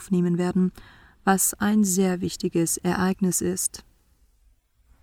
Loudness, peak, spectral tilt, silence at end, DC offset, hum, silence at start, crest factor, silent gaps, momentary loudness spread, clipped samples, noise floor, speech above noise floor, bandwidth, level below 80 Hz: -23 LUFS; -8 dBFS; -5 dB/octave; 1.2 s; under 0.1%; none; 0 s; 18 dB; none; 7 LU; under 0.1%; -61 dBFS; 38 dB; 18.5 kHz; -54 dBFS